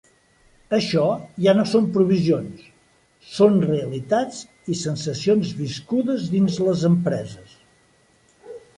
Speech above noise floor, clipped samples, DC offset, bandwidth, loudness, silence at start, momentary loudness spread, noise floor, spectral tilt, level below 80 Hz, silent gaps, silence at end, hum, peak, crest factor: 39 dB; under 0.1%; under 0.1%; 11.5 kHz; -21 LUFS; 0.7 s; 13 LU; -59 dBFS; -6.5 dB/octave; -58 dBFS; none; 0.2 s; none; -4 dBFS; 18 dB